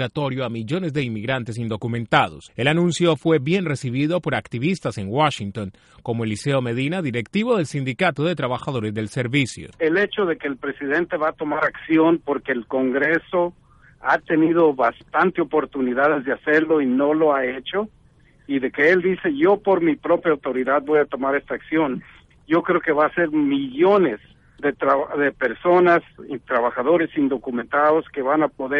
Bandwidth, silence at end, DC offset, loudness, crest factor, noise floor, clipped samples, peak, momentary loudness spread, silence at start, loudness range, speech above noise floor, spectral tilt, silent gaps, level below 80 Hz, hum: 11.5 kHz; 0 s; under 0.1%; -21 LUFS; 20 dB; -54 dBFS; under 0.1%; -2 dBFS; 8 LU; 0 s; 3 LU; 33 dB; -6.5 dB/octave; none; -56 dBFS; none